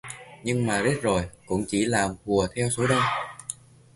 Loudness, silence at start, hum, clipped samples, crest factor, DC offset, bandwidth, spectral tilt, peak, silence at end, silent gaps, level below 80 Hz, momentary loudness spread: -25 LUFS; 0.05 s; none; under 0.1%; 18 dB; under 0.1%; 11.5 kHz; -4.5 dB/octave; -8 dBFS; 0.4 s; none; -48 dBFS; 13 LU